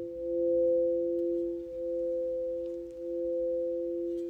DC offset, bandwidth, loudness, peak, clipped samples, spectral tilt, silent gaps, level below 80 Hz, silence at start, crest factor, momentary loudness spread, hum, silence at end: under 0.1%; 3.1 kHz; -32 LUFS; -20 dBFS; under 0.1%; -9.5 dB/octave; none; -60 dBFS; 0 s; 12 dB; 9 LU; none; 0 s